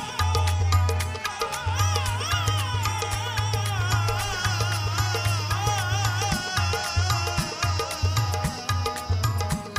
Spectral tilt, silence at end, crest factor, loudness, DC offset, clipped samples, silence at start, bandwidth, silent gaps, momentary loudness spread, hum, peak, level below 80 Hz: -3.5 dB/octave; 0 s; 18 dB; -25 LUFS; under 0.1%; under 0.1%; 0 s; 15.5 kHz; none; 4 LU; none; -6 dBFS; -38 dBFS